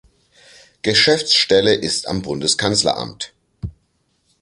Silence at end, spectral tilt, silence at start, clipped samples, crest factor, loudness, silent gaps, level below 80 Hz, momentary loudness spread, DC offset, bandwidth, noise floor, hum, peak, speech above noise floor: 0.7 s; -3 dB/octave; 0.85 s; under 0.1%; 20 dB; -16 LUFS; none; -46 dBFS; 20 LU; under 0.1%; 11.5 kHz; -65 dBFS; none; 0 dBFS; 48 dB